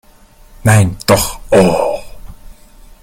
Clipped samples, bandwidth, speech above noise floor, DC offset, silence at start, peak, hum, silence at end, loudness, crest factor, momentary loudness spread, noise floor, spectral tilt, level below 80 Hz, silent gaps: under 0.1%; 16.5 kHz; 32 dB; under 0.1%; 0.65 s; 0 dBFS; none; 0.5 s; -12 LUFS; 14 dB; 8 LU; -43 dBFS; -5.5 dB/octave; -34 dBFS; none